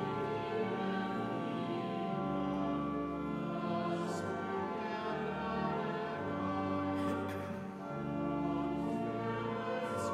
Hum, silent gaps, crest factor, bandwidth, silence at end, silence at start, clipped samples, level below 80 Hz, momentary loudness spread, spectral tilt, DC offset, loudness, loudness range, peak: none; none; 14 dB; 13.5 kHz; 0 s; 0 s; under 0.1%; -62 dBFS; 3 LU; -7 dB/octave; under 0.1%; -37 LUFS; 1 LU; -24 dBFS